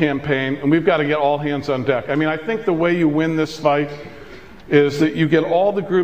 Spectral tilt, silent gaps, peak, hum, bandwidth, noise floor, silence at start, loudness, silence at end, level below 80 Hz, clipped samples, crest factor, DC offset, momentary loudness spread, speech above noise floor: -7 dB/octave; none; -2 dBFS; none; 9 kHz; -39 dBFS; 0 s; -18 LUFS; 0 s; -52 dBFS; under 0.1%; 16 dB; 0.6%; 5 LU; 22 dB